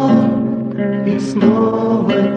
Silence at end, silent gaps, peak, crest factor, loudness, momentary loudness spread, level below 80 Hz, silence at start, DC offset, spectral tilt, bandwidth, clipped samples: 0 s; none; 0 dBFS; 14 dB; -15 LUFS; 6 LU; -52 dBFS; 0 s; under 0.1%; -8 dB/octave; 8.8 kHz; under 0.1%